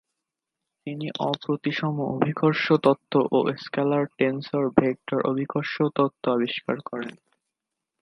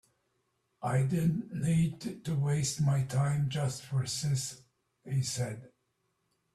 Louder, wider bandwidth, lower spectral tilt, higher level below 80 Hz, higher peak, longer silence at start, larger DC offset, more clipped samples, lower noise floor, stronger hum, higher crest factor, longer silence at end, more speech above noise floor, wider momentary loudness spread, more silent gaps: first, -25 LUFS vs -32 LUFS; second, 6.4 kHz vs 13.5 kHz; first, -8 dB/octave vs -5.5 dB/octave; about the same, -66 dBFS vs -62 dBFS; first, 0 dBFS vs -18 dBFS; about the same, 0.85 s vs 0.8 s; neither; neither; first, -85 dBFS vs -78 dBFS; neither; first, 24 dB vs 14 dB; about the same, 0.9 s vs 0.85 s; first, 61 dB vs 48 dB; about the same, 10 LU vs 8 LU; neither